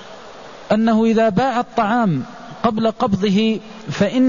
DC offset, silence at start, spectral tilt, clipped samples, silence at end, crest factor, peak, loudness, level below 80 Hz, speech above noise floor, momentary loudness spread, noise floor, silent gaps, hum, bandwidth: 0.5%; 0 s; -7 dB/octave; under 0.1%; 0 s; 14 dB; -4 dBFS; -18 LUFS; -50 dBFS; 21 dB; 19 LU; -37 dBFS; none; none; 7.4 kHz